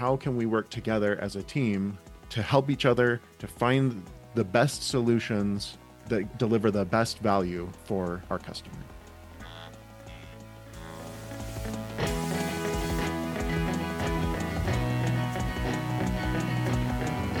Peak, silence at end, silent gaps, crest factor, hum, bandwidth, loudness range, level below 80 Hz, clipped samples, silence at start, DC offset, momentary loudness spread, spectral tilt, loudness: -6 dBFS; 0 s; none; 22 dB; none; 18 kHz; 11 LU; -42 dBFS; under 0.1%; 0 s; under 0.1%; 19 LU; -6 dB/octave; -29 LUFS